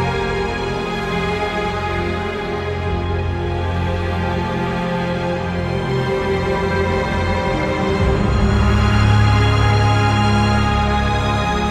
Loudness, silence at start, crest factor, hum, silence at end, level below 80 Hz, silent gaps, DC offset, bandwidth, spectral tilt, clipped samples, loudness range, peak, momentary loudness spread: -18 LUFS; 0 s; 14 dB; none; 0 s; -26 dBFS; none; under 0.1%; 10.5 kHz; -6.5 dB/octave; under 0.1%; 6 LU; -4 dBFS; 7 LU